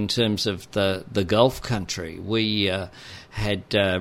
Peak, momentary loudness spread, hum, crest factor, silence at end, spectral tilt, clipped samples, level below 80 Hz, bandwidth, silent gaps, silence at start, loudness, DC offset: -2 dBFS; 10 LU; none; 22 dB; 0 s; -5 dB/octave; under 0.1%; -46 dBFS; 16 kHz; none; 0 s; -24 LUFS; under 0.1%